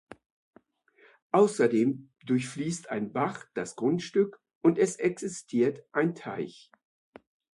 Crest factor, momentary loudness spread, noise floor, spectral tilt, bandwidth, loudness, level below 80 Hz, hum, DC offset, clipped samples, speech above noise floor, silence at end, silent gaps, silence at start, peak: 20 dB; 12 LU; -63 dBFS; -6 dB/octave; 11.5 kHz; -29 LUFS; -74 dBFS; none; under 0.1%; under 0.1%; 35 dB; 1.05 s; 4.55-4.61 s; 1.35 s; -10 dBFS